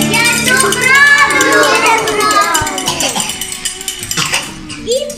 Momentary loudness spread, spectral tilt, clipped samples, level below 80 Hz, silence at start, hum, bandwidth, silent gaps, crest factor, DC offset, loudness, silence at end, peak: 12 LU; -1.5 dB/octave; 0.4%; -40 dBFS; 0 s; none; over 20 kHz; none; 12 dB; 0.1%; -10 LUFS; 0 s; 0 dBFS